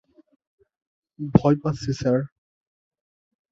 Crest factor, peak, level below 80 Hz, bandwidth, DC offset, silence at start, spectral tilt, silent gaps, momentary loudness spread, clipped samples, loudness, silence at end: 24 dB; -2 dBFS; -50 dBFS; 7.8 kHz; under 0.1%; 1.2 s; -8 dB/octave; none; 14 LU; under 0.1%; -22 LUFS; 1.25 s